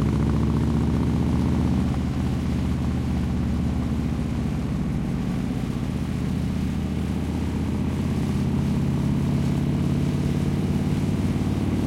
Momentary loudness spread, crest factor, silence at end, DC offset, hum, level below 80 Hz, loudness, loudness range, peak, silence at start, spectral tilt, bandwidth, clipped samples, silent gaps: 4 LU; 12 dB; 0 s; under 0.1%; none; -34 dBFS; -24 LUFS; 3 LU; -12 dBFS; 0 s; -8 dB/octave; 14 kHz; under 0.1%; none